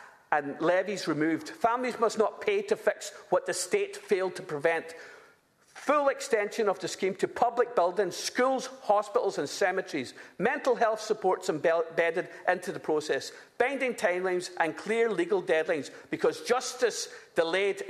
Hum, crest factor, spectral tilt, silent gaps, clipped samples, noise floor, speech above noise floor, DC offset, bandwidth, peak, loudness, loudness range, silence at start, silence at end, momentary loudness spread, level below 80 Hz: none; 20 dB; -3.5 dB/octave; none; under 0.1%; -62 dBFS; 33 dB; under 0.1%; 14 kHz; -8 dBFS; -29 LUFS; 2 LU; 0 s; 0 s; 6 LU; -78 dBFS